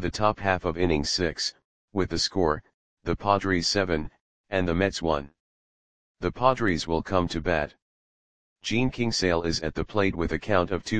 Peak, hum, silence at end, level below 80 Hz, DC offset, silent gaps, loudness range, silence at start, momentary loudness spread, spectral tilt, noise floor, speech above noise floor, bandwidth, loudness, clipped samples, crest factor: -6 dBFS; none; 0 s; -44 dBFS; 0.8%; 1.64-1.88 s, 2.74-2.97 s, 4.20-4.44 s, 5.40-6.15 s, 7.82-8.56 s; 2 LU; 0 s; 9 LU; -4.5 dB/octave; under -90 dBFS; over 64 dB; 10 kHz; -26 LUFS; under 0.1%; 22 dB